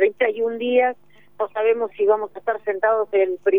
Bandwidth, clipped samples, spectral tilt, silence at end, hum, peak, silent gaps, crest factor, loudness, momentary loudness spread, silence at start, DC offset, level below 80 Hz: 3.8 kHz; under 0.1%; -6.5 dB/octave; 0 s; none; -6 dBFS; none; 14 dB; -21 LUFS; 7 LU; 0 s; 0.3%; -70 dBFS